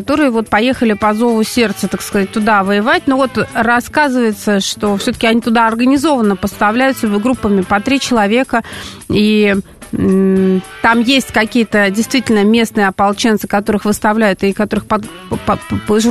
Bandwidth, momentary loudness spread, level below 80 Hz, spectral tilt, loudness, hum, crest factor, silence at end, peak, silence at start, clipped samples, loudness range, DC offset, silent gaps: 13.5 kHz; 6 LU; -40 dBFS; -5 dB/octave; -13 LUFS; none; 12 dB; 0 s; 0 dBFS; 0 s; under 0.1%; 2 LU; 0.3%; none